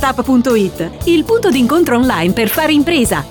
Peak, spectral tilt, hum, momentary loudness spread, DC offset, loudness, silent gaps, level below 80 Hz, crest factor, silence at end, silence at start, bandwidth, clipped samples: -2 dBFS; -5 dB/octave; none; 3 LU; under 0.1%; -13 LUFS; none; -34 dBFS; 10 dB; 0 s; 0 s; over 20 kHz; under 0.1%